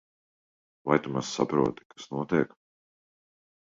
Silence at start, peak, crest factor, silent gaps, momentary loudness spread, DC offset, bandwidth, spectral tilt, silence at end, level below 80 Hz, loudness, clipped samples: 0.85 s; -8 dBFS; 22 dB; 1.85-1.90 s; 11 LU; under 0.1%; 7.8 kHz; -5.5 dB/octave; 1.2 s; -64 dBFS; -29 LUFS; under 0.1%